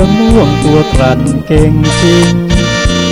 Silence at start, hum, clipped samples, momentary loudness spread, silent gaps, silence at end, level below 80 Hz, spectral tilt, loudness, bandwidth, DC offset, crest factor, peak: 0 s; none; 1%; 3 LU; none; 0 s; -18 dBFS; -5.5 dB/octave; -9 LUFS; 16 kHz; under 0.1%; 8 dB; 0 dBFS